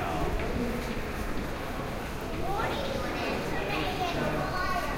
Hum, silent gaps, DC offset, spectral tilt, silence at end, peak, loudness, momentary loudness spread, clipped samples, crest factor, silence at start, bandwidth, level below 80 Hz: none; none; under 0.1%; -5 dB/octave; 0 s; -18 dBFS; -32 LUFS; 5 LU; under 0.1%; 14 dB; 0 s; 16 kHz; -38 dBFS